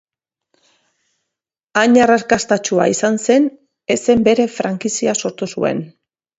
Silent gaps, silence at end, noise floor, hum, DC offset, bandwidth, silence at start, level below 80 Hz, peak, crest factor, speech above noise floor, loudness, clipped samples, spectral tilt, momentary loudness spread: none; 0.5 s; -82 dBFS; none; under 0.1%; 8.2 kHz; 1.75 s; -54 dBFS; 0 dBFS; 16 dB; 67 dB; -16 LUFS; under 0.1%; -4 dB/octave; 9 LU